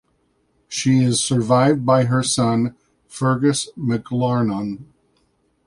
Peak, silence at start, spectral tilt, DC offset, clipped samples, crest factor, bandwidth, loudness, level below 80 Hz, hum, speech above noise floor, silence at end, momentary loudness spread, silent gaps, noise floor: -2 dBFS; 0.7 s; -5.5 dB/octave; under 0.1%; under 0.1%; 18 dB; 11.5 kHz; -19 LUFS; -56 dBFS; none; 46 dB; 0.8 s; 11 LU; none; -65 dBFS